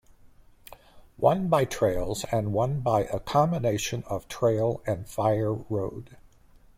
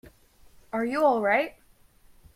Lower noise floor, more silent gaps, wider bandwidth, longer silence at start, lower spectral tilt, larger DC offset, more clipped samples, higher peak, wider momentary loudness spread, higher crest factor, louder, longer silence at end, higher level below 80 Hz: about the same, -55 dBFS vs -58 dBFS; neither; about the same, 16.5 kHz vs 16 kHz; second, 0.25 s vs 0.75 s; about the same, -6 dB/octave vs -5.5 dB/octave; neither; neither; first, -8 dBFS vs -12 dBFS; second, 8 LU vs 12 LU; about the same, 20 dB vs 18 dB; about the same, -27 LUFS vs -25 LUFS; second, 0.65 s vs 0.85 s; first, -48 dBFS vs -60 dBFS